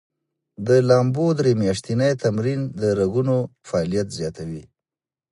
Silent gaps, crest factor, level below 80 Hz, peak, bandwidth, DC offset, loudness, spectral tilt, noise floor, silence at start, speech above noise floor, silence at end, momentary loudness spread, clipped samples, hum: none; 18 dB; -52 dBFS; -4 dBFS; 11.5 kHz; under 0.1%; -21 LUFS; -7 dB/octave; under -90 dBFS; 0.6 s; over 70 dB; 0.7 s; 12 LU; under 0.1%; none